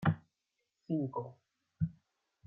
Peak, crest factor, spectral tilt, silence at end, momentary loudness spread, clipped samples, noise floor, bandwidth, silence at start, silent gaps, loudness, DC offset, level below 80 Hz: -18 dBFS; 22 dB; -10 dB/octave; 0.55 s; 8 LU; under 0.1%; -85 dBFS; 3.7 kHz; 0 s; none; -39 LUFS; under 0.1%; -66 dBFS